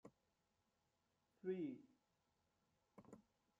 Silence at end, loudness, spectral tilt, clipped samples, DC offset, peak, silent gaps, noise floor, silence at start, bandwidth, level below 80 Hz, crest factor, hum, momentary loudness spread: 0.4 s; -51 LUFS; -8 dB/octave; under 0.1%; under 0.1%; -36 dBFS; none; -87 dBFS; 0.05 s; 7.4 kHz; under -90 dBFS; 22 dB; none; 21 LU